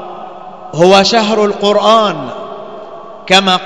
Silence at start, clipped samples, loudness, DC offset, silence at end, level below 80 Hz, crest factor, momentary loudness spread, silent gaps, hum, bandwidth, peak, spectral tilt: 0 s; 1%; -9 LUFS; 0.9%; 0 s; -52 dBFS; 12 dB; 22 LU; none; none; 11 kHz; 0 dBFS; -4 dB/octave